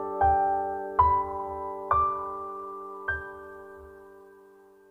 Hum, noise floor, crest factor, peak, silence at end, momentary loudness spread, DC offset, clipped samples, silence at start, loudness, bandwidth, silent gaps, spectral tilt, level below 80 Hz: none; -55 dBFS; 20 dB; -8 dBFS; 0.55 s; 21 LU; under 0.1%; under 0.1%; 0 s; -28 LUFS; 4.3 kHz; none; -8 dB/octave; -46 dBFS